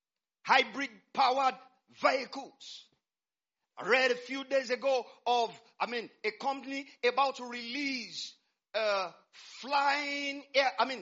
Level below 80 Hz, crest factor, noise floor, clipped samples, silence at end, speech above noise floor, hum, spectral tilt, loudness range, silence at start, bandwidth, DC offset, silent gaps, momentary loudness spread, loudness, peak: -88 dBFS; 24 dB; under -90 dBFS; under 0.1%; 0 s; over 58 dB; none; 1 dB/octave; 3 LU; 0.45 s; 7.6 kHz; under 0.1%; none; 16 LU; -31 LUFS; -10 dBFS